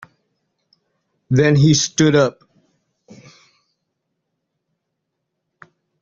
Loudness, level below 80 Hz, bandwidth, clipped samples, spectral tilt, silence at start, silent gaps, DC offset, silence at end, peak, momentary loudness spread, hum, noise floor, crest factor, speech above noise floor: -15 LUFS; -54 dBFS; 7.6 kHz; under 0.1%; -5 dB/octave; 1.3 s; none; under 0.1%; 3.7 s; -2 dBFS; 7 LU; none; -77 dBFS; 18 dB; 63 dB